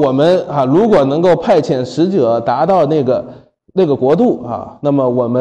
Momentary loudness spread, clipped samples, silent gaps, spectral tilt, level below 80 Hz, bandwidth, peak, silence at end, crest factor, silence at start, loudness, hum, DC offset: 8 LU; under 0.1%; none; -8 dB/octave; -50 dBFS; 9.2 kHz; -2 dBFS; 0 s; 10 dB; 0 s; -13 LUFS; none; under 0.1%